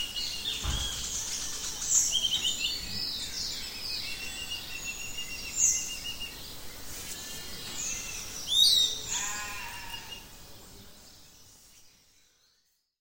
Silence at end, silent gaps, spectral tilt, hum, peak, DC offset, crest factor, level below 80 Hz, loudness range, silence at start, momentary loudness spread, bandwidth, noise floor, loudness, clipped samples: 1.1 s; none; 0.5 dB/octave; none; -10 dBFS; under 0.1%; 22 dB; -48 dBFS; 11 LU; 0 s; 18 LU; 17 kHz; -72 dBFS; -29 LUFS; under 0.1%